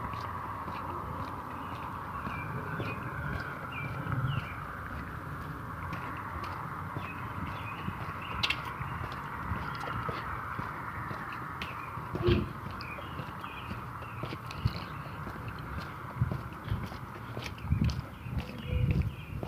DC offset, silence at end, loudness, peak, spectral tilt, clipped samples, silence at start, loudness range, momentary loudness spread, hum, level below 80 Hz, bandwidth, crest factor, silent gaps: under 0.1%; 0 s; -37 LUFS; -14 dBFS; -6.5 dB/octave; under 0.1%; 0 s; 3 LU; 9 LU; none; -46 dBFS; 15.5 kHz; 22 dB; none